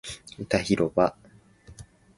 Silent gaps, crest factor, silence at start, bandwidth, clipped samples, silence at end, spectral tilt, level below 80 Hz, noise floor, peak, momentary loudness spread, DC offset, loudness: none; 22 dB; 0.05 s; 11.5 kHz; under 0.1%; 0.35 s; -5.5 dB/octave; -52 dBFS; -52 dBFS; -6 dBFS; 16 LU; under 0.1%; -25 LUFS